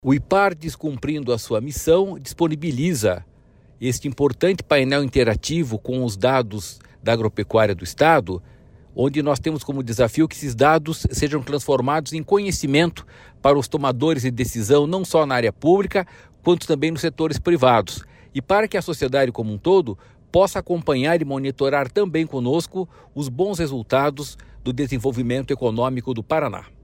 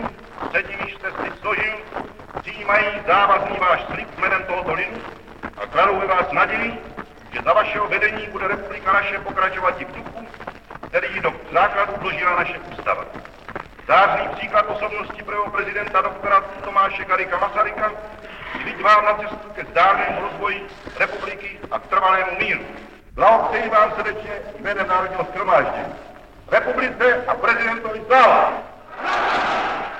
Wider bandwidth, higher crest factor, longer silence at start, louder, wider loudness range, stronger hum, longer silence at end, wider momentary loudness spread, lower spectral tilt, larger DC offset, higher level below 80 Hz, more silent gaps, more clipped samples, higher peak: first, 16.5 kHz vs 9.6 kHz; about the same, 16 dB vs 20 dB; about the same, 0.05 s vs 0 s; about the same, -21 LUFS vs -19 LUFS; about the same, 3 LU vs 4 LU; neither; first, 0.2 s vs 0 s; second, 11 LU vs 17 LU; about the same, -5.5 dB/octave vs -5 dB/octave; neither; first, -42 dBFS vs -48 dBFS; neither; neither; about the same, -4 dBFS vs -2 dBFS